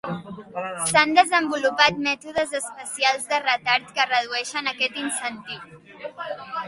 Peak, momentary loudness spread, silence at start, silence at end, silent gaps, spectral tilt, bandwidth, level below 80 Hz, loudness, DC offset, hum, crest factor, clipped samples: 0 dBFS; 17 LU; 0.05 s; 0 s; none; -2 dB/octave; 11.5 kHz; -62 dBFS; -22 LUFS; under 0.1%; none; 22 dB; under 0.1%